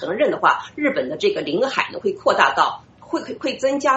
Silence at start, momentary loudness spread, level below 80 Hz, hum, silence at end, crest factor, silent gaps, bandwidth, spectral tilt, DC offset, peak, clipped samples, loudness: 0 s; 10 LU; -62 dBFS; none; 0 s; 20 dB; none; 8 kHz; -1.5 dB/octave; under 0.1%; 0 dBFS; under 0.1%; -20 LUFS